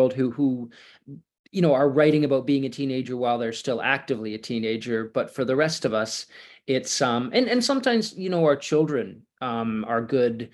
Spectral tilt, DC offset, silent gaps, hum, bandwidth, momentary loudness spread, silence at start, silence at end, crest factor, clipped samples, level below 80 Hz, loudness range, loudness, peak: -5 dB/octave; under 0.1%; 1.39-1.44 s; none; 12.5 kHz; 10 LU; 0 s; 0.05 s; 18 dB; under 0.1%; -68 dBFS; 3 LU; -24 LUFS; -6 dBFS